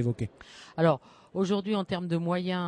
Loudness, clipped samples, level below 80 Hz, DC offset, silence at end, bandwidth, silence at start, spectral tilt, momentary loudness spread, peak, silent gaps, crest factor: -30 LUFS; under 0.1%; -62 dBFS; under 0.1%; 0 s; 10 kHz; 0 s; -7.5 dB/octave; 12 LU; -10 dBFS; none; 18 dB